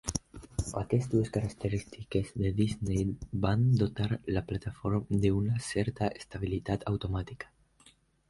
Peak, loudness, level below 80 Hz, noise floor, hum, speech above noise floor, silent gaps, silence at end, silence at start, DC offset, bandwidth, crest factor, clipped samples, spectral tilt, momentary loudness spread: -12 dBFS; -32 LUFS; -46 dBFS; -63 dBFS; none; 32 dB; none; 0.85 s; 0.05 s; under 0.1%; 11.5 kHz; 18 dB; under 0.1%; -6.5 dB/octave; 9 LU